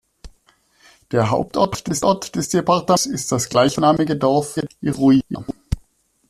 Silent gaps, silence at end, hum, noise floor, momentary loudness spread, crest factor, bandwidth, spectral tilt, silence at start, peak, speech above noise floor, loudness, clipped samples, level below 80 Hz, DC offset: none; 0.5 s; none; -58 dBFS; 12 LU; 16 dB; 14 kHz; -5 dB/octave; 0.25 s; -2 dBFS; 40 dB; -19 LUFS; under 0.1%; -42 dBFS; under 0.1%